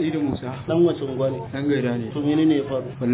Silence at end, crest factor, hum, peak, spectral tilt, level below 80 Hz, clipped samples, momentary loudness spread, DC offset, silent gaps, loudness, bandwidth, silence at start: 0 s; 14 dB; none; -8 dBFS; -12 dB/octave; -52 dBFS; under 0.1%; 7 LU; under 0.1%; none; -23 LUFS; 4 kHz; 0 s